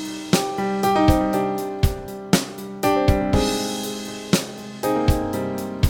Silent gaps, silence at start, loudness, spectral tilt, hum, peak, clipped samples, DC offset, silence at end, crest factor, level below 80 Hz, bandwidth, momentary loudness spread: none; 0 s; -22 LUFS; -5 dB/octave; none; -2 dBFS; under 0.1%; under 0.1%; 0 s; 20 dB; -30 dBFS; 19.5 kHz; 9 LU